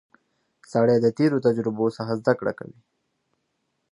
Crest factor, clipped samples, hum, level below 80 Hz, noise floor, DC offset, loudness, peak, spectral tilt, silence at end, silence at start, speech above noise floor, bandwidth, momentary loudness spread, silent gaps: 20 dB; under 0.1%; none; -68 dBFS; -75 dBFS; under 0.1%; -23 LUFS; -4 dBFS; -8 dB/octave; 1.4 s; 0.75 s; 53 dB; 11 kHz; 10 LU; none